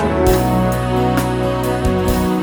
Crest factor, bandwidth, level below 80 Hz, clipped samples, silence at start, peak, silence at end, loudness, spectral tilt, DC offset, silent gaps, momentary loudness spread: 14 dB; over 20 kHz; -26 dBFS; under 0.1%; 0 s; -2 dBFS; 0 s; -16 LUFS; -6.5 dB/octave; under 0.1%; none; 4 LU